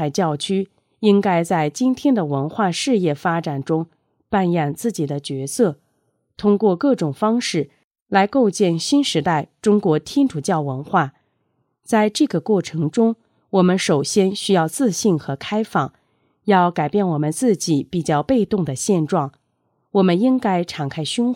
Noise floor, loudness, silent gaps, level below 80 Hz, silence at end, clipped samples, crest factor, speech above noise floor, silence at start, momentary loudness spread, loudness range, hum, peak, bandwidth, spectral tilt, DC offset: -69 dBFS; -19 LUFS; 7.84-7.91 s, 8.02-8.06 s; -58 dBFS; 0 s; under 0.1%; 16 dB; 50 dB; 0 s; 7 LU; 2 LU; none; -2 dBFS; 16.5 kHz; -5.5 dB/octave; under 0.1%